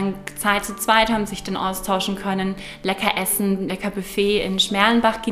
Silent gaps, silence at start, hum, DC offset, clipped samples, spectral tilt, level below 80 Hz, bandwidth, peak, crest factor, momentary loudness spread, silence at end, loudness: none; 0 s; none; under 0.1%; under 0.1%; -3.5 dB/octave; -44 dBFS; 16 kHz; 0 dBFS; 20 dB; 9 LU; 0 s; -21 LUFS